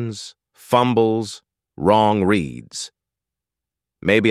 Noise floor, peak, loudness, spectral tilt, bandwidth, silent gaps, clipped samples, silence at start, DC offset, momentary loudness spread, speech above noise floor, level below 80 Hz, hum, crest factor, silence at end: -86 dBFS; -2 dBFS; -19 LUFS; -5.5 dB/octave; 14.5 kHz; none; under 0.1%; 0 s; under 0.1%; 18 LU; 68 dB; -52 dBFS; none; 18 dB; 0 s